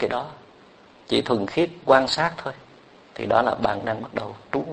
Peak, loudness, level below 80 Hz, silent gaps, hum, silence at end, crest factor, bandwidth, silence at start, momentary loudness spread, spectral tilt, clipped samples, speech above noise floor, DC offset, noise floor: -2 dBFS; -23 LUFS; -56 dBFS; none; none; 0 s; 24 dB; 9.2 kHz; 0 s; 16 LU; -5 dB/octave; under 0.1%; 28 dB; under 0.1%; -51 dBFS